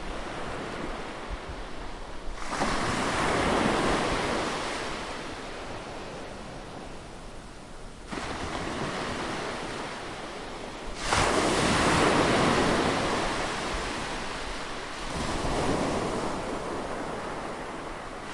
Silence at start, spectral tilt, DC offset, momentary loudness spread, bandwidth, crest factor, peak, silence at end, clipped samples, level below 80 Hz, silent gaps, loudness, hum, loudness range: 0 s; -4 dB/octave; under 0.1%; 17 LU; 11.5 kHz; 20 dB; -10 dBFS; 0 s; under 0.1%; -42 dBFS; none; -29 LUFS; none; 11 LU